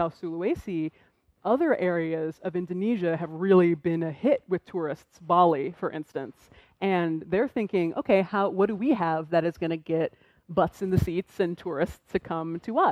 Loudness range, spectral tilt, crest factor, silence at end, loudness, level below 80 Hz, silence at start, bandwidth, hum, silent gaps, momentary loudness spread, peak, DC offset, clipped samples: 3 LU; -8 dB/octave; 18 dB; 0 s; -27 LUFS; -54 dBFS; 0 s; 14.5 kHz; none; none; 10 LU; -8 dBFS; under 0.1%; under 0.1%